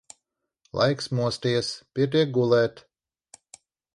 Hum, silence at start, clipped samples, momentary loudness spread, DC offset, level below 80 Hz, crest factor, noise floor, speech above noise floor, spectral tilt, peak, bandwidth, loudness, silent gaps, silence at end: none; 0.75 s; under 0.1%; 7 LU; under 0.1%; -62 dBFS; 18 dB; -80 dBFS; 56 dB; -5.5 dB/octave; -8 dBFS; 11.5 kHz; -24 LUFS; none; 1.15 s